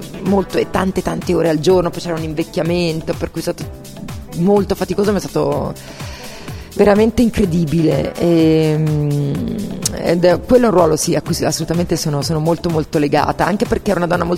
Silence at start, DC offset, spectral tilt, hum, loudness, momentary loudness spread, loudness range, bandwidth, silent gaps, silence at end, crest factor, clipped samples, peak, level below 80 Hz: 0 s; under 0.1%; -6 dB/octave; none; -16 LUFS; 13 LU; 4 LU; 16.5 kHz; none; 0 s; 16 dB; under 0.1%; 0 dBFS; -36 dBFS